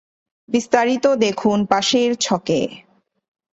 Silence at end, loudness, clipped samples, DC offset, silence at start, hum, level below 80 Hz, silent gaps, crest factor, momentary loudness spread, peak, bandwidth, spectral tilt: 0.75 s; -18 LUFS; under 0.1%; under 0.1%; 0.5 s; none; -60 dBFS; none; 18 dB; 6 LU; -2 dBFS; 8.2 kHz; -4 dB/octave